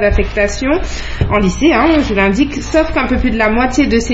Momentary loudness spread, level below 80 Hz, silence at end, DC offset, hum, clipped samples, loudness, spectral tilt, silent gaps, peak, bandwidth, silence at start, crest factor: 5 LU; -22 dBFS; 0 s; under 0.1%; none; under 0.1%; -13 LUFS; -5.5 dB/octave; none; 0 dBFS; 8 kHz; 0 s; 12 dB